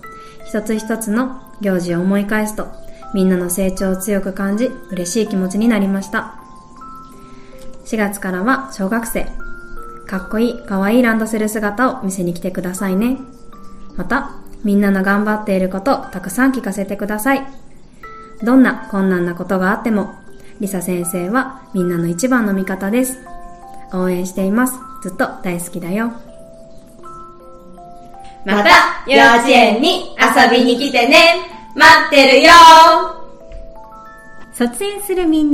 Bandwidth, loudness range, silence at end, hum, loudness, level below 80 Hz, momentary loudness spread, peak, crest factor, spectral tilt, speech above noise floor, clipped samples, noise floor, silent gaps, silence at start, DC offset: 15.5 kHz; 13 LU; 0 s; none; -14 LUFS; -38 dBFS; 17 LU; 0 dBFS; 16 dB; -4 dB/octave; 23 dB; 0.7%; -37 dBFS; none; 0.05 s; under 0.1%